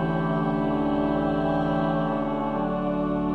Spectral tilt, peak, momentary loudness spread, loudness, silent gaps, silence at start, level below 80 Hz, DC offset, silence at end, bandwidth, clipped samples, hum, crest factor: -9.5 dB/octave; -12 dBFS; 2 LU; -25 LUFS; none; 0 s; -42 dBFS; under 0.1%; 0 s; 5.6 kHz; under 0.1%; none; 12 dB